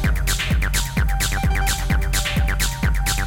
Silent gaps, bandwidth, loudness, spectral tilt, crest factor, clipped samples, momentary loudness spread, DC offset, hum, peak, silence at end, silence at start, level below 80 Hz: none; 17.5 kHz; -21 LUFS; -3.5 dB/octave; 10 dB; under 0.1%; 1 LU; under 0.1%; none; -10 dBFS; 0 s; 0 s; -22 dBFS